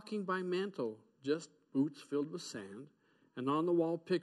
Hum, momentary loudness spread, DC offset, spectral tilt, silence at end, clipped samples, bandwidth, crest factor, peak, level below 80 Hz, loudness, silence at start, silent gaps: none; 13 LU; under 0.1%; -6 dB/octave; 0 s; under 0.1%; 12 kHz; 16 dB; -22 dBFS; -88 dBFS; -38 LUFS; 0.05 s; none